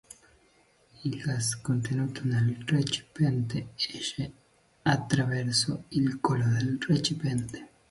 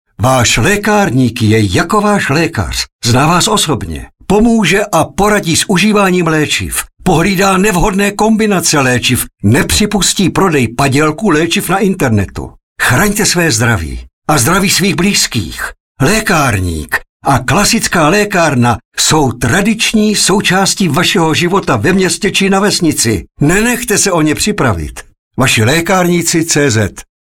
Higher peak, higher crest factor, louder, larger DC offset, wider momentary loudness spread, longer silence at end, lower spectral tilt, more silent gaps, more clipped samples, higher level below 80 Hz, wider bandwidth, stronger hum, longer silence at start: second, -10 dBFS vs 0 dBFS; first, 20 dB vs 10 dB; second, -29 LUFS vs -10 LUFS; second, under 0.1% vs 0.3%; about the same, 7 LU vs 6 LU; about the same, 0.25 s vs 0.25 s; about the same, -5 dB/octave vs -4 dB/octave; second, none vs 2.92-2.99 s, 12.63-12.76 s, 14.13-14.22 s, 15.80-15.95 s, 17.09-17.20 s, 18.85-18.92 s, 25.19-25.31 s; neither; second, -58 dBFS vs -30 dBFS; second, 11.5 kHz vs 17.5 kHz; neither; first, 1 s vs 0.2 s